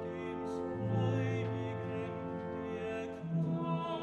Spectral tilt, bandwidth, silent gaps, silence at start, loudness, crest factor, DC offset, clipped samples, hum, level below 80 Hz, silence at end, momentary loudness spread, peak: -8.5 dB/octave; 8.4 kHz; none; 0 s; -37 LUFS; 14 dB; under 0.1%; under 0.1%; none; -66 dBFS; 0 s; 7 LU; -22 dBFS